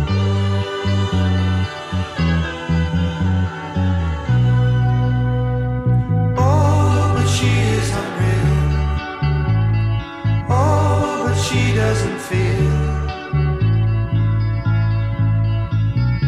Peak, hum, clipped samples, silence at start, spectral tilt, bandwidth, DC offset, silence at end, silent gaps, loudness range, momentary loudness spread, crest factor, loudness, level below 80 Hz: -4 dBFS; none; under 0.1%; 0 s; -6.5 dB/octave; 12 kHz; under 0.1%; 0 s; none; 3 LU; 5 LU; 12 dB; -18 LUFS; -28 dBFS